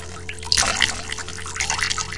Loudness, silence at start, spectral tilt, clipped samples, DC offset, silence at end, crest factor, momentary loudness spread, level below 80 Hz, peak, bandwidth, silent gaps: -21 LUFS; 0 s; -0.5 dB/octave; under 0.1%; 1%; 0 s; 24 dB; 13 LU; -40 dBFS; 0 dBFS; 12 kHz; none